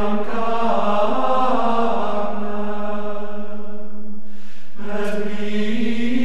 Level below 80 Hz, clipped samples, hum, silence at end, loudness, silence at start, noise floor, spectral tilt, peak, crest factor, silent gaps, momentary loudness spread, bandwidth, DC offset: -60 dBFS; under 0.1%; none; 0 s; -23 LUFS; 0 s; -44 dBFS; -6.5 dB/octave; -4 dBFS; 14 dB; none; 17 LU; 12.5 kHz; 20%